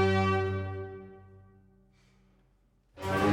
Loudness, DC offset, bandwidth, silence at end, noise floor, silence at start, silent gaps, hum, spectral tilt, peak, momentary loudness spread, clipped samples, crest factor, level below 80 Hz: -31 LUFS; under 0.1%; 15.5 kHz; 0 s; -67 dBFS; 0 s; none; none; -7 dB/octave; -16 dBFS; 23 LU; under 0.1%; 16 dB; -60 dBFS